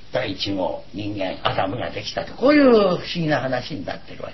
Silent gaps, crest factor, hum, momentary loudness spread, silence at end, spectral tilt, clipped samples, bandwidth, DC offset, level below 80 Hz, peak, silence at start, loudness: none; 18 dB; none; 15 LU; 0 s; -6 dB/octave; under 0.1%; 6.2 kHz; 1%; -48 dBFS; -4 dBFS; 0.15 s; -21 LUFS